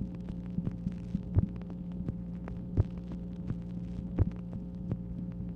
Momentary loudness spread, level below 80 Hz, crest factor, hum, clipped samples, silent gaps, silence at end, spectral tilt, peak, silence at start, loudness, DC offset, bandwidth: 8 LU; -44 dBFS; 22 dB; none; under 0.1%; none; 0 s; -10.5 dB/octave; -12 dBFS; 0 s; -37 LUFS; under 0.1%; 5.4 kHz